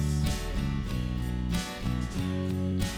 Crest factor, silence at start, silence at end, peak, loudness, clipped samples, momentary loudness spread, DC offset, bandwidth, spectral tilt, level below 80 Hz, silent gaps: 14 dB; 0 s; 0 s; -14 dBFS; -31 LUFS; under 0.1%; 3 LU; under 0.1%; 19 kHz; -6 dB/octave; -36 dBFS; none